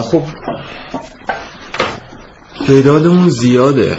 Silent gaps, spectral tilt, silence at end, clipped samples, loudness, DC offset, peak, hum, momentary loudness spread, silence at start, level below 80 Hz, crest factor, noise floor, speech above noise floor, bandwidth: none; -7 dB/octave; 0 s; under 0.1%; -12 LUFS; under 0.1%; 0 dBFS; none; 17 LU; 0 s; -44 dBFS; 12 dB; -36 dBFS; 25 dB; 8 kHz